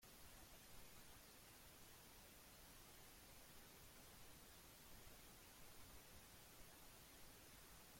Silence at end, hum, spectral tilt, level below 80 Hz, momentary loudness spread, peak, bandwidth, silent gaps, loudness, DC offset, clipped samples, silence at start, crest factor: 0 s; none; -2.5 dB/octave; -72 dBFS; 0 LU; -50 dBFS; 16.5 kHz; none; -63 LUFS; under 0.1%; under 0.1%; 0 s; 14 dB